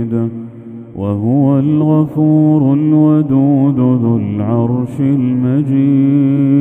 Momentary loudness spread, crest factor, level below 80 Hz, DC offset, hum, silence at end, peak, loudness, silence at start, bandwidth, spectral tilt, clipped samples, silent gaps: 9 LU; 12 dB; -52 dBFS; under 0.1%; none; 0 s; 0 dBFS; -12 LUFS; 0 s; 3.6 kHz; -12 dB/octave; under 0.1%; none